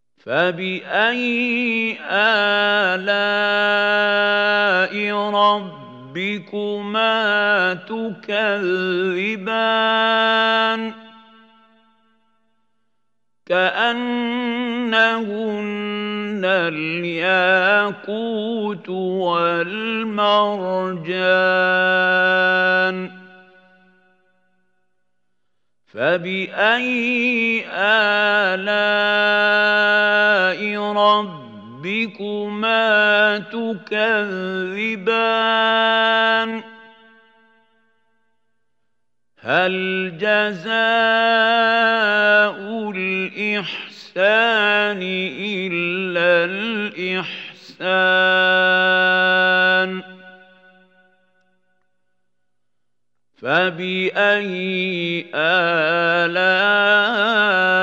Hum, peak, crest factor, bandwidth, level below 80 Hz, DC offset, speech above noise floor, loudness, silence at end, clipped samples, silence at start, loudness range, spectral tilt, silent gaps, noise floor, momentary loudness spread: none; -2 dBFS; 16 dB; 8 kHz; -80 dBFS; under 0.1%; 62 dB; -18 LUFS; 0 s; under 0.1%; 0.25 s; 7 LU; -5.5 dB/octave; none; -80 dBFS; 10 LU